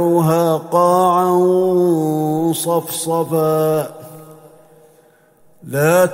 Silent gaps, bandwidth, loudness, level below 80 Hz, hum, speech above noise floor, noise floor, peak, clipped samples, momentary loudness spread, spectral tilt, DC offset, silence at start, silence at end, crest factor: none; 16.5 kHz; -16 LUFS; -60 dBFS; none; 37 dB; -51 dBFS; 0 dBFS; under 0.1%; 6 LU; -6 dB/octave; under 0.1%; 0 s; 0 s; 16 dB